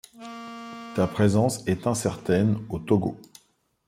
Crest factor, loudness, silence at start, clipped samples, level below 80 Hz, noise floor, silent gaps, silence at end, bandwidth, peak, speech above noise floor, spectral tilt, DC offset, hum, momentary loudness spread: 18 dB; -25 LUFS; 0.15 s; under 0.1%; -56 dBFS; -66 dBFS; none; 0.65 s; 16 kHz; -8 dBFS; 42 dB; -6.5 dB/octave; under 0.1%; none; 17 LU